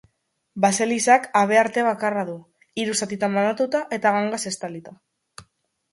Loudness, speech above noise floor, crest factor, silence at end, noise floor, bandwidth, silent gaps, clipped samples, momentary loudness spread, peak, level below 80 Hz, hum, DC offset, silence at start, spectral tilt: -21 LUFS; 50 dB; 20 dB; 0.5 s; -72 dBFS; 11.5 kHz; none; under 0.1%; 16 LU; -4 dBFS; -70 dBFS; none; under 0.1%; 0.55 s; -3.5 dB/octave